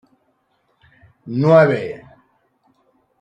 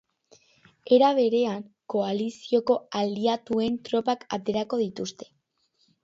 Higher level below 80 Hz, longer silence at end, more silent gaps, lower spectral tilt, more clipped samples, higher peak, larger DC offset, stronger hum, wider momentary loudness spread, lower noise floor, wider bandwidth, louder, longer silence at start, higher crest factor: first, -62 dBFS vs -68 dBFS; first, 1.25 s vs 0.8 s; neither; first, -8.5 dB/octave vs -5.5 dB/octave; neither; first, -2 dBFS vs -8 dBFS; neither; neither; first, 19 LU vs 11 LU; second, -65 dBFS vs -70 dBFS; about the same, 7.6 kHz vs 7.8 kHz; first, -15 LUFS vs -26 LUFS; first, 1.25 s vs 0.85 s; about the same, 18 dB vs 18 dB